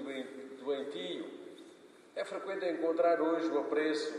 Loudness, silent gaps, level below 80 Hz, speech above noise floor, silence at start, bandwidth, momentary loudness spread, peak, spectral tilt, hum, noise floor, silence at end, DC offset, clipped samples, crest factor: -34 LUFS; none; under -90 dBFS; 24 dB; 0 s; 11 kHz; 17 LU; -18 dBFS; -4 dB/octave; none; -57 dBFS; 0 s; under 0.1%; under 0.1%; 18 dB